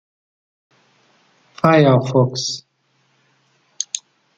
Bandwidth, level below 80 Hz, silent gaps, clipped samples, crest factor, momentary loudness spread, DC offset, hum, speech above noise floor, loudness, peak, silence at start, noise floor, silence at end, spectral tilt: 9.2 kHz; -62 dBFS; none; under 0.1%; 18 dB; 15 LU; under 0.1%; none; 49 dB; -17 LUFS; -2 dBFS; 1.65 s; -63 dBFS; 0.4 s; -5.5 dB/octave